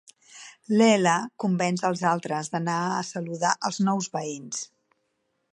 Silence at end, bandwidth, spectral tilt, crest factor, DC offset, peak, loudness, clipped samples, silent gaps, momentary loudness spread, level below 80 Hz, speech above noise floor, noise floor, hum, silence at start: 0.9 s; 11 kHz; -4.5 dB/octave; 20 dB; under 0.1%; -6 dBFS; -25 LUFS; under 0.1%; none; 14 LU; -76 dBFS; 50 dB; -75 dBFS; none; 0.35 s